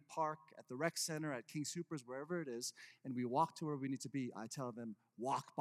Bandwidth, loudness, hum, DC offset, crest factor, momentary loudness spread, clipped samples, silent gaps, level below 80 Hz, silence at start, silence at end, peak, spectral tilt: 15.5 kHz; -43 LUFS; none; under 0.1%; 20 dB; 9 LU; under 0.1%; none; under -90 dBFS; 0.1 s; 0 s; -24 dBFS; -4.5 dB/octave